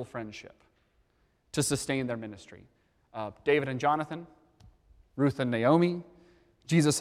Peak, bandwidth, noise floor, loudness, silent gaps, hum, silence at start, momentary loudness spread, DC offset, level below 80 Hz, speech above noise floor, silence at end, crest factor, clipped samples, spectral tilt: -12 dBFS; 15.5 kHz; -70 dBFS; -29 LUFS; none; none; 0 s; 20 LU; under 0.1%; -64 dBFS; 41 dB; 0 s; 20 dB; under 0.1%; -5 dB/octave